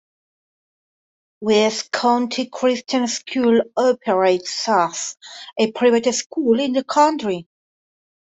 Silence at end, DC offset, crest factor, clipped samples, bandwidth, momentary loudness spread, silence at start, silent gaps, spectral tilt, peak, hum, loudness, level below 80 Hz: 0.9 s; under 0.1%; 16 dB; under 0.1%; 8.4 kHz; 9 LU; 1.4 s; 6.26-6.30 s; -3.5 dB/octave; -4 dBFS; none; -19 LUFS; -66 dBFS